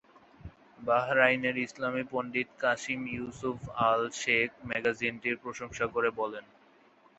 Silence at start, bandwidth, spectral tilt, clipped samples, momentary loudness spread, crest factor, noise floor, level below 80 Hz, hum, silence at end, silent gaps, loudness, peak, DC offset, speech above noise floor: 0.45 s; 8.2 kHz; -4 dB/octave; under 0.1%; 11 LU; 24 dB; -62 dBFS; -62 dBFS; none; 0.75 s; none; -30 LUFS; -8 dBFS; under 0.1%; 31 dB